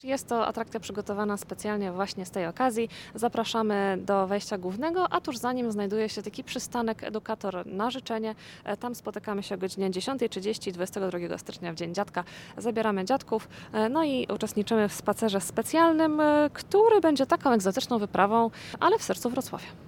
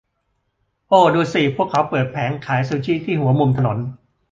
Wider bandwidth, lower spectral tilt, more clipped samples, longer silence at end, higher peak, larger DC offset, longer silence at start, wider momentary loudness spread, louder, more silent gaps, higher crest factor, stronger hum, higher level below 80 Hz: first, 18 kHz vs 7.6 kHz; second, -4.5 dB/octave vs -7.5 dB/octave; neither; second, 0 s vs 0.35 s; second, -8 dBFS vs -2 dBFS; neither; second, 0.05 s vs 0.9 s; first, 11 LU vs 8 LU; second, -28 LUFS vs -18 LUFS; neither; about the same, 20 dB vs 18 dB; neither; second, -62 dBFS vs -52 dBFS